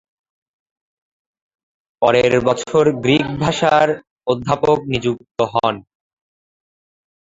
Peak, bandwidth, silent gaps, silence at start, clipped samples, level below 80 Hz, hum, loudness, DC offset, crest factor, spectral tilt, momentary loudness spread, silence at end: 0 dBFS; 7.8 kHz; 4.11-4.16 s, 5.31-5.35 s; 2 s; under 0.1%; -50 dBFS; none; -17 LUFS; under 0.1%; 18 dB; -5.5 dB/octave; 8 LU; 1.55 s